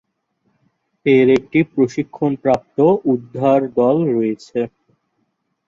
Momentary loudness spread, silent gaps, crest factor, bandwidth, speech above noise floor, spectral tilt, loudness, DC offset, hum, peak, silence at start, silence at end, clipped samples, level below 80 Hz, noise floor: 10 LU; none; 16 dB; 7.6 kHz; 53 dB; -8 dB/octave; -17 LUFS; under 0.1%; none; -2 dBFS; 1.05 s; 1 s; under 0.1%; -58 dBFS; -69 dBFS